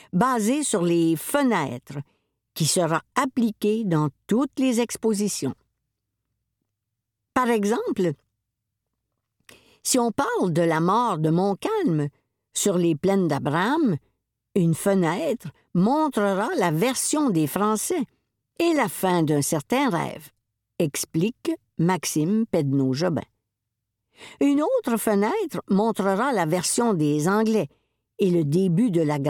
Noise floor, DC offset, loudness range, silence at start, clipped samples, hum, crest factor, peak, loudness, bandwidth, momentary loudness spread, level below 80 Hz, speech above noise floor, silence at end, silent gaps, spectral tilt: -82 dBFS; under 0.1%; 5 LU; 0.15 s; under 0.1%; none; 18 dB; -6 dBFS; -23 LUFS; 18.5 kHz; 7 LU; -66 dBFS; 60 dB; 0 s; none; -5.5 dB/octave